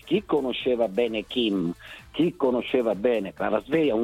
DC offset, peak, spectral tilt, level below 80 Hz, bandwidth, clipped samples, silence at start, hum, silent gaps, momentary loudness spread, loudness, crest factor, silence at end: under 0.1%; -10 dBFS; -6.5 dB/octave; -56 dBFS; 14.5 kHz; under 0.1%; 0.05 s; none; none; 4 LU; -25 LUFS; 14 dB; 0 s